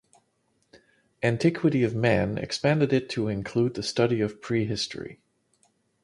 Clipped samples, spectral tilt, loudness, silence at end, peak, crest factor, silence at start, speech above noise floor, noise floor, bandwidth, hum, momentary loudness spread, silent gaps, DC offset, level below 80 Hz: under 0.1%; -6 dB/octave; -26 LUFS; 0.9 s; -8 dBFS; 20 dB; 1.2 s; 46 dB; -71 dBFS; 11.5 kHz; none; 6 LU; none; under 0.1%; -54 dBFS